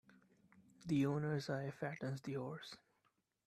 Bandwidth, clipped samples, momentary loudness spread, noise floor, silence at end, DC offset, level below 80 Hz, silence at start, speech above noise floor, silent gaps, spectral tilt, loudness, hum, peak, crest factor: 13 kHz; under 0.1%; 17 LU; -82 dBFS; 0.7 s; under 0.1%; -78 dBFS; 0.55 s; 41 dB; none; -7 dB/octave; -42 LUFS; none; -26 dBFS; 18 dB